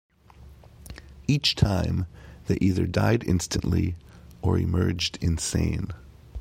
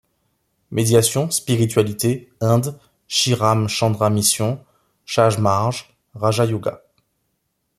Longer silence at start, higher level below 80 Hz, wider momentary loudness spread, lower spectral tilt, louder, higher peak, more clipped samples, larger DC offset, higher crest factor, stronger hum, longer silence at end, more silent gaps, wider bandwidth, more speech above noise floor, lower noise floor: second, 0.4 s vs 0.7 s; first, -40 dBFS vs -56 dBFS; first, 18 LU vs 9 LU; about the same, -5.5 dB/octave vs -4.5 dB/octave; second, -25 LUFS vs -19 LUFS; second, -6 dBFS vs -2 dBFS; neither; neither; about the same, 20 dB vs 18 dB; neither; second, 0 s vs 1.05 s; neither; first, 16 kHz vs 14.5 kHz; second, 25 dB vs 54 dB; second, -50 dBFS vs -72 dBFS